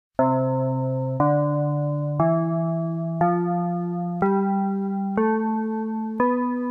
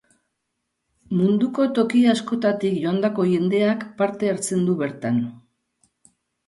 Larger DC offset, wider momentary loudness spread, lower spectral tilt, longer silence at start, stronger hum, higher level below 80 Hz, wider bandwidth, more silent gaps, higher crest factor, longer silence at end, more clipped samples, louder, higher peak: neither; about the same, 5 LU vs 6 LU; first, -12 dB/octave vs -6 dB/octave; second, 0.2 s vs 1.1 s; neither; first, -58 dBFS vs -66 dBFS; second, 3 kHz vs 11.5 kHz; neither; about the same, 14 dB vs 16 dB; second, 0 s vs 1.1 s; neither; about the same, -23 LUFS vs -21 LUFS; about the same, -8 dBFS vs -6 dBFS